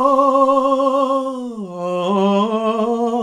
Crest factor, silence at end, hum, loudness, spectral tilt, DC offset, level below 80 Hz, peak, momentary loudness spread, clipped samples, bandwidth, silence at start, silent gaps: 14 dB; 0 s; none; -17 LUFS; -7 dB/octave; under 0.1%; -60 dBFS; -2 dBFS; 12 LU; under 0.1%; 10.5 kHz; 0 s; none